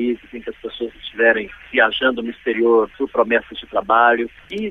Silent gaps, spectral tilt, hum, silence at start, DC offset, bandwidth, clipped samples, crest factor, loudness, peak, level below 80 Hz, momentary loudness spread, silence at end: none; -6 dB/octave; none; 0 s; under 0.1%; 6 kHz; under 0.1%; 18 dB; -18 LUFS; 0 dBFS; -50 dBFS; 14 LU; 0 s